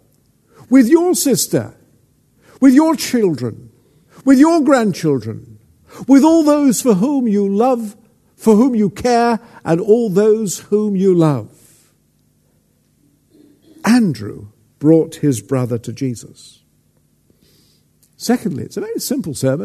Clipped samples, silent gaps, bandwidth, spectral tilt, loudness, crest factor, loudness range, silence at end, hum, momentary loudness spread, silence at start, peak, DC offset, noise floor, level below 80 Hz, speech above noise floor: under 0.1%; none; 13.5 kHz; -6 dB/octave; -15 LUFS; 16 dB; 9 LU; 0 s; none; 13 LU; 0.7 s; 0 dBFS; under 0.1%; -58 dBFS; -56 dBFS; 44 dB